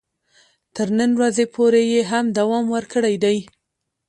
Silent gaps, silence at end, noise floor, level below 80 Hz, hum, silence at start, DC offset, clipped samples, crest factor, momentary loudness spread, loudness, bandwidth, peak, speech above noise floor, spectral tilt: none; 0.65 s; -78 dBFS; -64 dBFS; none; 0.75 s; under 0.1%; under 0.1%; 14 dB; 6 LU; -19 LUFS; 11 kHz; -6 dBFS; 60 dB; -5 dB/octave